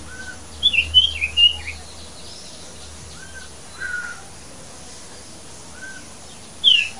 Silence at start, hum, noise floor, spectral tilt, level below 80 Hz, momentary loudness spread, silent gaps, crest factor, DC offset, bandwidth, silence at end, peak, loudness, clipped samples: 0 s; none; -40 dBFS; -0.5 dB/octave; -46 dBFS; 24 LU; none; 22 dB; 0.9%; 11.5 kHz; 0 s; -2 dBFS; -16 LUFS; under 0.1%